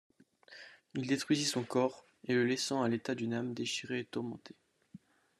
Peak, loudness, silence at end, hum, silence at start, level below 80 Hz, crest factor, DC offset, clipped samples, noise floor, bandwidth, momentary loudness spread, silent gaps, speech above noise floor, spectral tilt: -18 dBFS; -35 LUFS; 0.4 s; none; 0.5 s; -80 dBFS; 18 dB; under 0.1%; under 0.1%; -59 dBFS; 13 kHz; 18 LU; none; 24 dB; -4 dB/octave